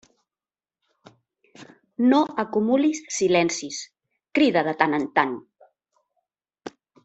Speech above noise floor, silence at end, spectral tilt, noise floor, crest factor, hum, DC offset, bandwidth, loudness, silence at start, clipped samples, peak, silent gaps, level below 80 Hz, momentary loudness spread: over 69 dB; 0.35 s; -4 dB/octave; under -90 dBFS; 22 dB; none; under 0.1%; 8.2 kHz; -22 LUFS; 1.6 s; under 0.1%; -2 dBFS; none; -68 dBFS; 22 LU